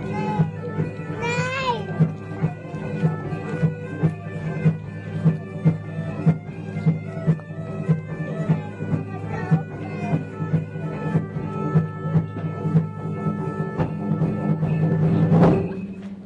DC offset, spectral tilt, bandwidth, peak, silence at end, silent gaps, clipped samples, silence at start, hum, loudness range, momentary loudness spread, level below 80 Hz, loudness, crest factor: under 0.1%; -8.5 dB/octave; 7.6 kHz; -6 dBFS; 0 s; none; under 0.1%; 0 s; none; 4 LU; 8 LU; -50 dBFS; -24 LUFS; 16 dB